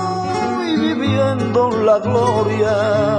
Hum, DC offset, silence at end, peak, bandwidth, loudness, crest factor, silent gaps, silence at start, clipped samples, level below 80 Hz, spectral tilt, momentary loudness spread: none; under 0.1%; 0 s; -2 dBFS; 10.5 kHz; -17 LUFS; 14 dB; none; 0 s; under 0.1%; -48 dBFS; -6.5 dB/octave; 5 LU